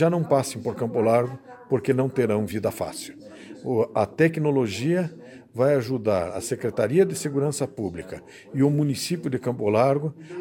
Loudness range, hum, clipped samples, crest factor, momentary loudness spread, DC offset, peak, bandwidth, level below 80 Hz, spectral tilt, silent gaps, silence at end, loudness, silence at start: 1 LU; none; under 0.1%; 18 dB; 15 LU; under 0.1%; -6 dBFS; 17 kHz; -62 dBFS; -6.5 dB/octave; none; 0 s; -24 LUFS; 0 s